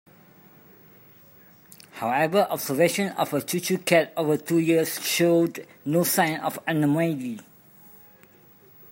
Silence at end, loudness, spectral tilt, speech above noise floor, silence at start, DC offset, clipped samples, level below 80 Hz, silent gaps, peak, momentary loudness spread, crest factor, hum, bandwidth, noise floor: 1.5 s; -24 LUFS; -4.5 dB/octave; 30 dB; 1.95 s; under 0.1%; under 0.1%; -72 dBFS; none; -6 dBFS; 8 LU; 20 dB; none; 16.5 kHz; -54 dBFS